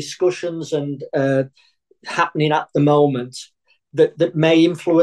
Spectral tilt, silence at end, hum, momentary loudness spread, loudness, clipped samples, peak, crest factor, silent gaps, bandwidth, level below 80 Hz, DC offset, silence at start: -6.5 dB/octave; 0 s; none; 13 LU; -18 LUFS; under 0.1%; -2 dBFS; 16 dB; none; 11.5 kHz; -66 dBFS; under 0.1%; 0 s